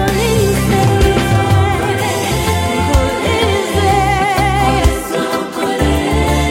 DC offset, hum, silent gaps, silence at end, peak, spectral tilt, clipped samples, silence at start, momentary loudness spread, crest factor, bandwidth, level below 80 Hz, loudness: under 0.1%; none; none; 0 s; 0 dBFS; -5 dB/octave; under 0.1%; 0 s; 3 LU; 12 dB; 16.5 kHz; -22 dBFS; -14 LUFS